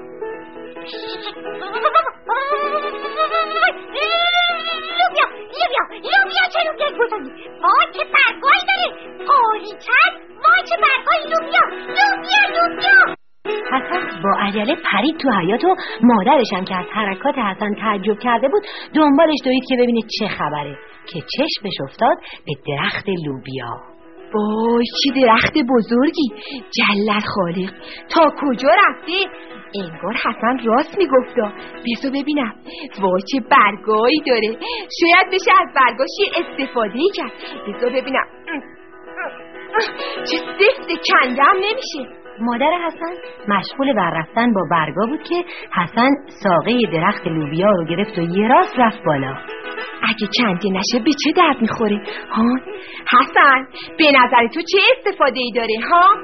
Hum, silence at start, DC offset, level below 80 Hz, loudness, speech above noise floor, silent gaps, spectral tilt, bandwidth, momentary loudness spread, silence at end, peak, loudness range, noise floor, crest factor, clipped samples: none; 0 s; 0.5%; -54 dBFS; -16 LUFS; 22 dB; none; -2 dB/octave; 6.4 kHz; 15 LU; 0 s; -2 dBFS; 6 LU; -39 dBFS; 16 dB; under 0.1%